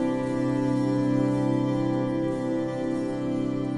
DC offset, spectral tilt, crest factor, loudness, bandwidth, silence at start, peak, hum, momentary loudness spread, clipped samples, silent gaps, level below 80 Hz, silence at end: 0.1%; -8 dB/octave; 12 dB; -26 LUFS; 11.5 kHz; 0 s; -14 dBFS; none; 4 LU; under 0.1%; none; -54 dBFS; 0 s